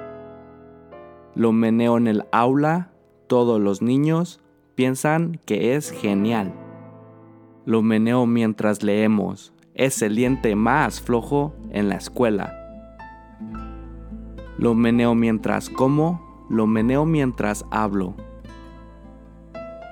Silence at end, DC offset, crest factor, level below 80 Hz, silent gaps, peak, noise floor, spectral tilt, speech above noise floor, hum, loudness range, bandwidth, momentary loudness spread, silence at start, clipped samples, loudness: 0 s; under 0.1%; 18 dB; -44 dBFS; none; -2 dBFS; -47 dBFS; -6.5 dB/octave; 27 dB; none; 4 LU; 17.5 kHz; 21 LU; 0 s; under 0.1%; -21 LUFS